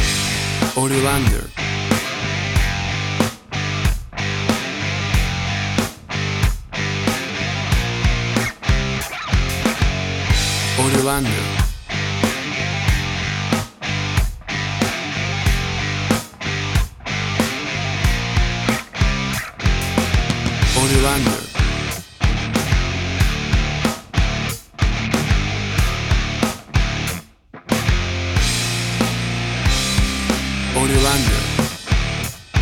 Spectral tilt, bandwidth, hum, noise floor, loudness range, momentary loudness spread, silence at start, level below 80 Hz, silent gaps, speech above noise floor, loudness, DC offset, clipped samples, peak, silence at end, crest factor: -4 dB/octave; 18 kHz; none; -41 dBFS; 3 LU; 6 LU; 0 s; -26 dBFS; none; 24 dB; -20 LUFS; under 0.1%; under 0.1%; -2 dBFS; 0 s; 18 dB